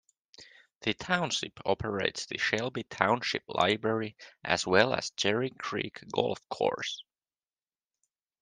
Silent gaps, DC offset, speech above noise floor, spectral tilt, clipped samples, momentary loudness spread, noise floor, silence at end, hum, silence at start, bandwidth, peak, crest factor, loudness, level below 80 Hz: 0.76-0.81 s; under 0.1%; over 59 dB; -3.5 dB/octave; under 0.1%; 9 LU; under -90 dBFS; 1.4 s; none; 0.4 s; 10 kHz; -4 dBFS; 28 dB; -30 LUFS; -66 dBFS